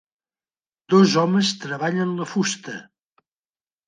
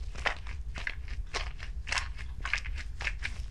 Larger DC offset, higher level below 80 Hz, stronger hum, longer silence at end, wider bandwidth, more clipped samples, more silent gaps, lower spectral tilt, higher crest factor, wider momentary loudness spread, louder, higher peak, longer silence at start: second, under 0.1% vs 0.7%; second, -72 dBFS vs -38 dBFS; neither; first, 1.05 s vs 0 s; second, 9.6 kHz vs 11.5 kHz; neither; neither; first, -5 dB/octave vs -2.5 dB/octave; about the same, 20 dB vs 24 dB; first, 14 LU vs 8 LU; first, -20 LUFS vs -36 LUFS; first, -4 dBFS vs -12 dBFS; first, 0.9 s vs 0 s